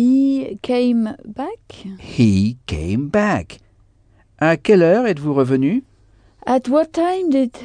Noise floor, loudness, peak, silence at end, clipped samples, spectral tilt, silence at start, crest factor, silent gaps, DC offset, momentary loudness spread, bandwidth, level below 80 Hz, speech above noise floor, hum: -54 dBFS; -18 LUFS; -2 dBFS; 0 s; under 0.1%; -7.5 dB/octave; 0 s; 14 dB; none; under 0.1%; 15 LU; 10 kHz; -44 dBFS; 37 dB; none